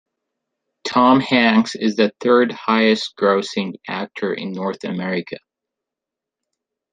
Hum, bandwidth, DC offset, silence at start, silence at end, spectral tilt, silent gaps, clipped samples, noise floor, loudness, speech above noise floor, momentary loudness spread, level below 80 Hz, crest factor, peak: none; 9.4 kHz; under 0.1%; 0.85 s; 1.55 s; -5.5 dB/octave; none; under 0.1%; -85 dBFS; -18 LUFS; 67 dB; 12 LU; -66 dBFS; 18 dB; -2 dBFS